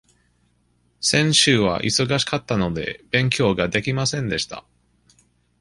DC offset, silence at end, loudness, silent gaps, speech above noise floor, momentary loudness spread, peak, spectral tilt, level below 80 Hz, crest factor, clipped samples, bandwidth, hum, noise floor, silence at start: under 0.1%; 1 s; -20 LUFS; none; 43 dB; 10 LU; -2 dBFS; -3.5 dB/octave; -48 dBFS; 20 dB; under 0.1%; 11.5 kHz; 60 Hz at -45 dBFS; -64 dBFS; 1 s